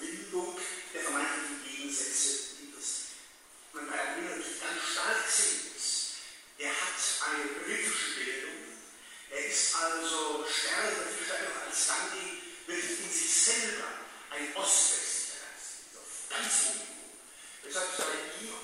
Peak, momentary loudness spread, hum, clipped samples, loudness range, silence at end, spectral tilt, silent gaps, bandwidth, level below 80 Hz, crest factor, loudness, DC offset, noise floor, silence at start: -12 dBFS; 17 LU; none; under 0.1%; 5 LU; 0 s; 1 dB/octave; none; 16 kHz; -76 dBFS; 22 dB; -31 LUFS; under 0.1%; -55 dBFS; 0 s